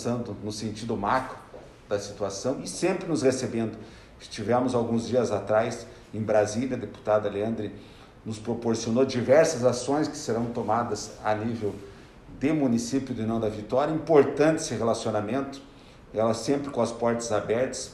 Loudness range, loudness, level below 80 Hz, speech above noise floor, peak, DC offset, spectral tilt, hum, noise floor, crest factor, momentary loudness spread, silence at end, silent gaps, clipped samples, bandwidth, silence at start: 4 LU; -27 LUFS; -56 dBFS; 20 dB; -6 dBFS; under 0.1%; -5.5 dB/octave; none; -46 dBFS; 20 dB; 13 LU; 0 s; none; under 0.1%; 12.5 kHz; 0 s